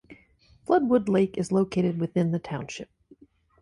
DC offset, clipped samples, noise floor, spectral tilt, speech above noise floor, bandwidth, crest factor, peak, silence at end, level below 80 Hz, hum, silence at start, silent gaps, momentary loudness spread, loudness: under 0.1%; under 0.1%; -59 dBFS; -7.5 dB/octave; 34 dB; 11 kHz; 18 dB; -10 dBFS; 0.75 s; -60 dBFS; none; 0.1 s; none; 17 LU; -25 LUFS